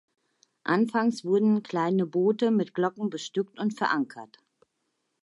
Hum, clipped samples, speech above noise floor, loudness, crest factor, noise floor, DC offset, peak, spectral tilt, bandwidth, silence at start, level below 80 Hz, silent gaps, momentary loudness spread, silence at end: none; under 0.1%; 52 dB; -27 LUFS; 16 dB; -78 dBFS; under 0.1%; -10 dBFS; -6.5 dB/octave; 11 kHz; 0.65 s; -82 dBFS; none; 8 LU; 0.95 s